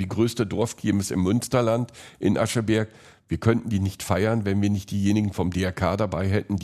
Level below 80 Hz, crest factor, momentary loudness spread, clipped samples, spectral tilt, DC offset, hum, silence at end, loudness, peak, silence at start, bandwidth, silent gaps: -54 dBFS; 18 dB; 4 LU; under 0.1%; -6 dB/octave; under 0.1%; none; 0 s; -24 LUFS; -6 dBFS; 0 s; 13.5 kHz; none